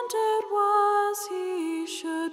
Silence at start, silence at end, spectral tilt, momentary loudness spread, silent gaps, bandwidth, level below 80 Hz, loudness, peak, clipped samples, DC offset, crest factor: 0 s; 0 s; -1 dB/octave; 9 LU; none; 16 kHz; -80 dBFS; -26 LUFS; -14 dBFS; under 0.1%; under 0.1%; 12 dB